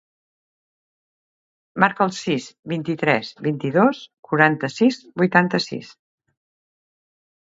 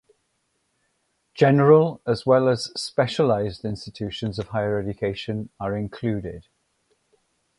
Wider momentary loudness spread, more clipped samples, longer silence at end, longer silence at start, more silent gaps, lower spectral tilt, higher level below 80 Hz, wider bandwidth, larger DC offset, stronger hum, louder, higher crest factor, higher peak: second, 11 LU vs 15 LU; neither; first, 1.7 s vs 1.15 s; first, 1.75 s vs 1.35 s; first, 2.59-2.63 s, 4.19-4.23 s vs none; about the same, -6 dB/octave vs -6.5 dB/octave; second, -68 dBFS vs -52 dBFS; second, 7.8 kHz vs 11.5 kHz; neither; neither; first, -20 LUFS vs -23 LUFS; about the same, 22 dB vs 20 dB; first, 0 dBFS vs -4 dBFS